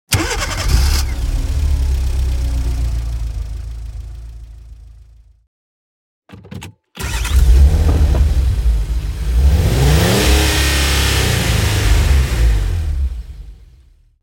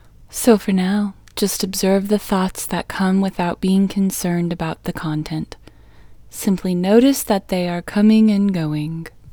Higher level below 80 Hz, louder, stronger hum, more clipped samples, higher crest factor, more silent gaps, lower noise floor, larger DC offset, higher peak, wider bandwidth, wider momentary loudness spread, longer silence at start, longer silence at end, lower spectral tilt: first, -16 dBFS vs -44 dBFS; about the same, -16 LUFS vs -18 LUFS; neither; neither; about the same, 14 dB vs 18 dB; first, 5.47-6.22 s vs none; first, -47 dBFS vs -43 dBFS; neither; about the same, 0 dBFS vs 0 dBFS; second, 17 kHz vs over 20 kHz; first, 19 LU vs 11 LU; second, 0.1 s vs 0.3 s; first, 0.7 s vs 0 s; about the same, -4.5 dB/octave vs -5.5 dB/octave